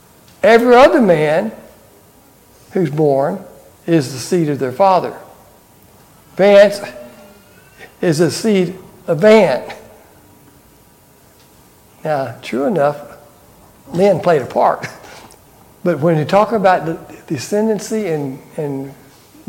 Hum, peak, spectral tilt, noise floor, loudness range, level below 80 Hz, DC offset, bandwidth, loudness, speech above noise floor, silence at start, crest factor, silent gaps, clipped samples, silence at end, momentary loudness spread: none; 0 dBFS; -6 dB/octave; -47 dBFS; 7 LU; -52 dBFS; under 0.1%; 17 kHz; -14 LUFS; 34 dB; 0.45 s; 16 dB; none; under 0.1%; 0.55 s; 19 LU